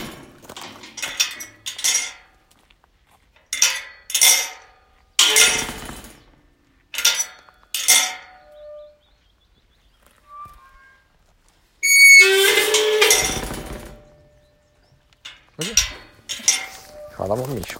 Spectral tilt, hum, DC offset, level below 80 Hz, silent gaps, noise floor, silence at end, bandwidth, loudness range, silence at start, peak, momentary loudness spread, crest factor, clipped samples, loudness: 0.5 dB/octave; none; under 0.1%; -48 dBFS; none; -59 dBFS; 0 s; 17 kHz; 11 LU; 0 s; 0 dBFS; 24 LU; 22 dB; under 0.1%; -15 LUFS